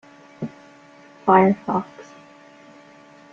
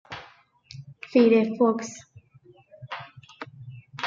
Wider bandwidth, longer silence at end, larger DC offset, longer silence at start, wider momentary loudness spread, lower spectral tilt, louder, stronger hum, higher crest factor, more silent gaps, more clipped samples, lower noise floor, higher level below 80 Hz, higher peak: about the same, 7.2 kHz vs 7.6 kHz; first, 1.3 s vs 0 s; neither; first, 0.4 s vs 0.1 s; second, 22 LU vs 26 LU; first, -8.5 dB/octave vs -5.5 dB/octave; first, -19 LUFS vs -22 LUFS; neither; about the same, 22 dB vs 20 dB; neither; neither; second, -48 dBFS vs -56 dBFS; first, -66 dBFS vs -72 dBFS; first, -2 dBFS vs -8 dBFS